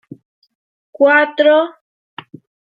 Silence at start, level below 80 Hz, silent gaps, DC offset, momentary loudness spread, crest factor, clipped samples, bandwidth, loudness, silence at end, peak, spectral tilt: 1 s; -76 dBFS; none; under 0.1%; 23 LU; 16 dB; under 0.1%; 5 kHz; -13 LUFS; 1.05 s; -2 dBFS; -6 dB/octave